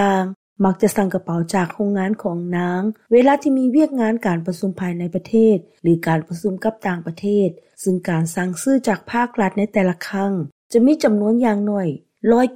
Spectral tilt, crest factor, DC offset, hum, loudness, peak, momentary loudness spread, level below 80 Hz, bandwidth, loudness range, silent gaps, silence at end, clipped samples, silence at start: -7 dB/octave; 14 dB; 0.2%; none; -19 LUFS; -4 dBFS; 8 LU; -56 dBFS; 16 kHz; 3 LU; 0.36-0.56 s, 10.52-10.70 s; 0 s; under 0.1%; 0 s